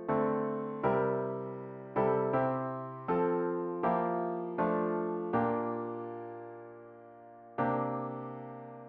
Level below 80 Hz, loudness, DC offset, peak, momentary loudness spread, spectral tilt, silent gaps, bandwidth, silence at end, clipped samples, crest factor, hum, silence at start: -70 dBFS; -33 LUFS; under 0.1%; -18 dBFS; 15 LU; -8 dB/octave; none; 4.5 kHz; 0 s; under 0.1%; 16 dB; none; 0 s